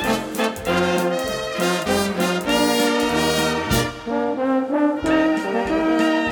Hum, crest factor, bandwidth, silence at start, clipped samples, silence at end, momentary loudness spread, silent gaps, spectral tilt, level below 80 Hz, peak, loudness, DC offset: none; 16 dB; 19.5 kHz; 0 s; under 0.1%; 0 s; 5 LU; none; -4.5 dB/octave; -42 dBFS; -4 dBFS; -20 LUFS; under 0.1%